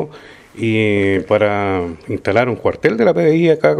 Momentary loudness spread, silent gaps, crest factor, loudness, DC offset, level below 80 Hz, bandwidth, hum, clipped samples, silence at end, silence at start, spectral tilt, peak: 10 LU; none; 16 dB; -16 LUFS; under 0.1%; -50 dBFS; 11.5 kHz; none; under 0.1%; 0 s; 0 s; -7.5 dB/octave; 0 dBFS